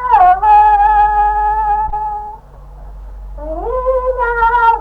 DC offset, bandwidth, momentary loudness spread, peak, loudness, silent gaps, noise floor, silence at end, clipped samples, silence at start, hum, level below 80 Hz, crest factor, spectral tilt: under 0.1%; 4.9 kHz; 18 LU; 0 dBFS; -12 LUFS; none; -34 dBFS; 0 s; under 0.1%; 0 s; none; -28 dBFS; 12 dB; -6.5 dB/octave